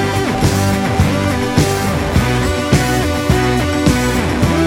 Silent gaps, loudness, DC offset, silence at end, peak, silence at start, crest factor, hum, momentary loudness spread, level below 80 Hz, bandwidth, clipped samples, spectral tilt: none; -15 LUFS; under 0.1%; 0 s; 0 dBFS; 0 s; 14 dB; none; 2 LU; -26 dBFS; 17 kHz; under 0.1%; -5.5 dB/octave